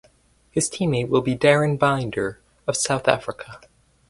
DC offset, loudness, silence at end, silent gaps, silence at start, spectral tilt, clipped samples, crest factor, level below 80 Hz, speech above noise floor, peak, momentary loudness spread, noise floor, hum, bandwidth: under 0.1%; -22 LUFS; 0.55 s; none; 0.55 s; -4.5 dB/octave; under 0.1%; 22 dB; -54 dBFS; 37 dB; 0 dBFS; 13 LU; -58 dBFS; none; 11.5 kHz